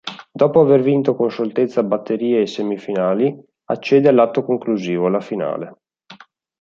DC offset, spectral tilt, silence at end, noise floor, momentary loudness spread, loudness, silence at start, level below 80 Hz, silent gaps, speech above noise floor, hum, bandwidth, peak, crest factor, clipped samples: under 0.1%; -7.5 dB/octave; 0.45 s; -45 dBFS; 11 LU; -17 LUFS; 0.05 s; -66 dBFS; none; 28 dB; none; 7.4 kHz; -2 dBFS; 16 dB; under 0.1%